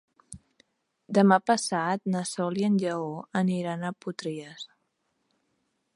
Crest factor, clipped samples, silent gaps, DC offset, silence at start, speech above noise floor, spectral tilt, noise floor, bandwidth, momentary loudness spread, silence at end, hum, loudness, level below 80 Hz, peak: 22 dB; under 0.1%; none; under 0.1%; 0.3 s; 49 dB; -5.5 dB/octave; -76 dBFS; 11.5 kHz; 16 LU; 1.3 s; none; -27 LUFS; -70 dBFS; -6 dBFS